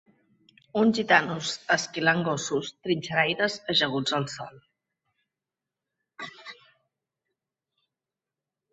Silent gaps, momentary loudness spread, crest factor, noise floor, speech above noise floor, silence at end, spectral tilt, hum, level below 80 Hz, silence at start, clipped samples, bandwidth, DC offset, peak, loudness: none; 19 LU; 26 dB; -89 dBFS; 63 dB; 2.2 s; -4 dB/octave; none; -70 dBFS; 0.75 s; under 0.1%; 8.2 kHz; under 0.1%; -4 dBFS; -25 LUFS